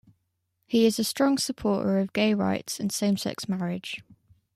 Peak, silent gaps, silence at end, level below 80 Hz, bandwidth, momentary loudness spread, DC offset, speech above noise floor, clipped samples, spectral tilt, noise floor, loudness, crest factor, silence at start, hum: -10 dBFS; none; 0.45 s; -62 dBFS; 15.5 kHz; 8 LU; under 0.1%; 51 dB; under 0.1%; -5 dB/octave; -76 dBFS; -26 LUFS; 16 dB; 0.7 s; none